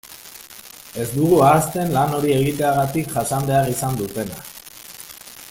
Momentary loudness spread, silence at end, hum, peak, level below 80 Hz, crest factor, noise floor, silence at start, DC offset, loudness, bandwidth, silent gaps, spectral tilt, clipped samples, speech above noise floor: 22 LU; 0 s; none; -2 dBFS; -48 dBFS; 18 dB; -41 dBFS; 0.05 s; under 0.1%; -19 LUFS; 17 kHz; none; -5.5 dB/octave; under 0.1%; 22 dB